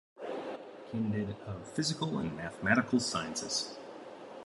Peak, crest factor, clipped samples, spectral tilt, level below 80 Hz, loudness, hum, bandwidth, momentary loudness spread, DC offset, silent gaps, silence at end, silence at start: -12 dBFS; 24 dB; under 0.1%; -4 dB/octave; -62 dBFS; -34 LUFS; none; 11.5 kHz; 16 LU; under 0.1%; none; 0 s; 0.15 s